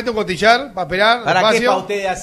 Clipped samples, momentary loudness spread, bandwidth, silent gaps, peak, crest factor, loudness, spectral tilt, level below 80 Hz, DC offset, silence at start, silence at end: under 0.1%; 7 LU; 14 kHz; none; 0 dBFS; 16 dB; -15 LUFS; -3.5 dB/octave; -46 dBFS; under 0.1%; 0 s; 0 s